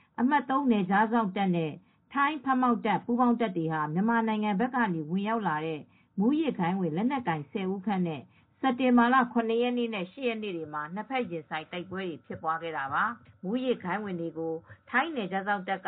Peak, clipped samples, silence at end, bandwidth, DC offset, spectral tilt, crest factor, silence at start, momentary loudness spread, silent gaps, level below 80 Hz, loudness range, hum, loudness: -12 dBFS; under 0.1%; 0 s; 4.1 kHz; under 0.1%; -5 dB/octave; 18 dB; 0.2 s; 11 LU; none; -74 dBFS; 5 LU; none; -29 LUFS